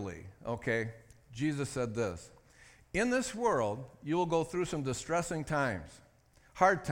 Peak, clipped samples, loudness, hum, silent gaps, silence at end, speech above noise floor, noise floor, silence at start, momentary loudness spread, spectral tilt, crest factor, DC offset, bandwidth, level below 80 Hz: -12 dBFS; under 0.1%; -34 LUFS; none; none; 0 s; 31 dB; -64 dBFS; 0 s; 12 LU; -5.5 dB/octave; 22 dB; under 0.1%; 17 kHz; -58 dBFS